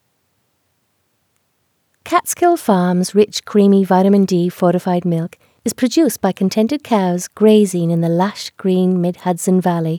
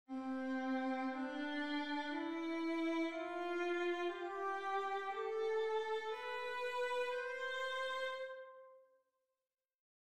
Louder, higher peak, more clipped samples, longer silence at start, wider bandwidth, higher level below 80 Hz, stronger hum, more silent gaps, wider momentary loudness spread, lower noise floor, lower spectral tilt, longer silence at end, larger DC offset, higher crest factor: first, -15 LUFS vs -41 LUFS; first, 0 dBFS vs -28 dBFS; neither; first, 2.05 s vs 0.05 s; first, 18.5 kHz vs 13.5 kHz; first, -64 dBFS vs -84 dBFS; neither; second, none vs 9.75-9.79 s; first, 7 LU vs 4 LU; second, -65 dBFS vs under -90 dBFS; first, -6 dB/octave vs -3 dB/octave; second, 0 s vs 0.2 s; neither; about the same, 16 dB vs 12 dB